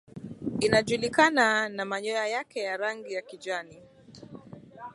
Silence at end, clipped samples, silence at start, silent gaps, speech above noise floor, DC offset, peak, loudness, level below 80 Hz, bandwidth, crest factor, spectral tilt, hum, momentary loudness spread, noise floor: 0 s; under 0.1%; 0.15 s; none; 20 dB; under 0.1%; -6 dBFS; -27 LUFS; -62 dBFS; 11.5 kHz; 22 dB; -4 dB/octave; none; 24 LU; -48 dBFS